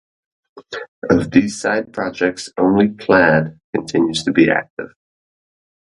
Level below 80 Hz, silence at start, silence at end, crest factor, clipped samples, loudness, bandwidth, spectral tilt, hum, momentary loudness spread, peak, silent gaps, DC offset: -48 dBFS; 0.55 s; 1.05 s; 18 dB; under 0.1%; -16 LUFS; 11 kHz; -5.5 dB/octave; none; 18 LU; 0 dBFS; 0.88-1.02 s, 3.64-3.73 s, 4.70-4.77 s; under 0.1%